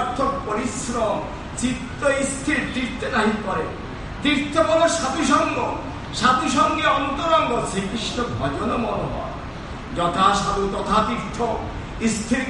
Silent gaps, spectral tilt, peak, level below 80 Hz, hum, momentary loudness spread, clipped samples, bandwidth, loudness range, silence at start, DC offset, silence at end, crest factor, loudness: none; -4 dB/octave; -2 dBFS; -38 dBFS; none; 11 LU; under 0.1%; 11.5 kHz; 4 LU; 0 s; under 0.1%; 0 s; 20 dB; -22 LUFS